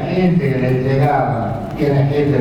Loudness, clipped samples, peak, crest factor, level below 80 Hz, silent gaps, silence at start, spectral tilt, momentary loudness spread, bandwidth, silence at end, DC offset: -16 LUFS; under 0.1%; -4 dBFS; 12 dB; -38 dBFS; none; 0 s; -9 dB/octave; 5 LU; 6.4 kHz; 0 s; under 0.1%